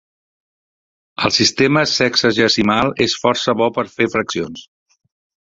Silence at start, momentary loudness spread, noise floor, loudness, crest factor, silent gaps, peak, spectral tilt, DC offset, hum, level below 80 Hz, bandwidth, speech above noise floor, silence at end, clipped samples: 1.2 s; 10 LU; under -90 dBFS; -16 LUFS; 16 dB; none; -2 dBFS; -3.5 dB/octave; under 0.1%; none; -50 dBFS; 7.8 kHz; over 74 dB; 0.85 s; under 0.1%